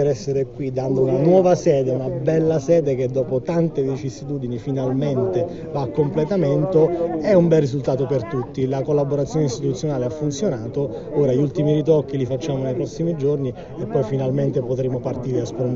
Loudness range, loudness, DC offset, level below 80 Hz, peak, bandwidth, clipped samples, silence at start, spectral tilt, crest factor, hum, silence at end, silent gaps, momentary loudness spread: 4 LU; -21 LUFS; under 0.1%; -48 dBFS; -2 dBFS; 7.6 kHz; under 0.1%; 0 s; -8.5 dB/octave; 16 dB; none; 0 s; none; 8 LU